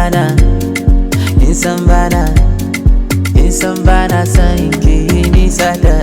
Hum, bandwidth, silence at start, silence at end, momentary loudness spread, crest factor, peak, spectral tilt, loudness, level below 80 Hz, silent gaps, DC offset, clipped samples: none; 16.5 kHz; 0 s; 0 s; 3 LU; 8 dB; 0 dBFS; -6 dB/octave; -11 LUFS; -12 dBFS; none; under 0.1%; 0.6%